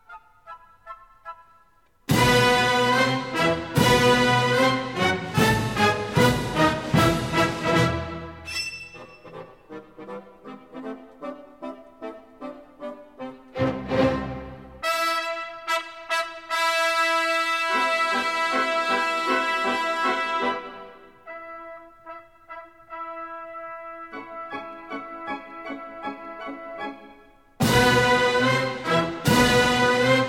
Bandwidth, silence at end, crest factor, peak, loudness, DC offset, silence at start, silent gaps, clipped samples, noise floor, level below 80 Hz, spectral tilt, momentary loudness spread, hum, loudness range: 17.5 kHz; 0 s; 20 dB; -4 dBFS; -22 LUFS; 0.1%; 0.1 s; none; under 0.1%; -61 dBFS; -46 dBFS; -4.5 dB/octave; 23 LU; none; 18 LU